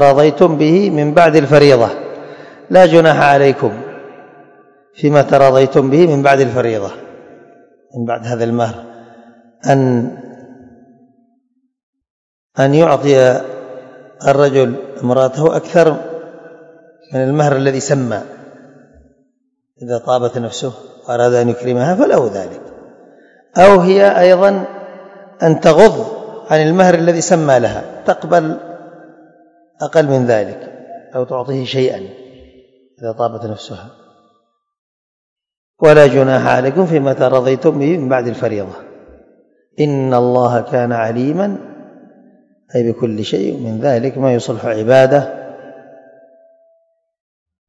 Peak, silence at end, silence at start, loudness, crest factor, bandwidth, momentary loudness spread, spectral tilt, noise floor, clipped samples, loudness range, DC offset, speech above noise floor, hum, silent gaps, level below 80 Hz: 0 dBFS; 1.9 s; 0 s; -12 LUFS; 14 dB; 11 kHz; 20 LU; -6.5 dB/octave; -66 dBFS; 0.7%; 9 LU; under 0.1%; 54 dB; none; 11.83-11.93 s, 12.10-12.50 s, 34.79-35.36 s, 35.57-35.74 s; -52 dBFS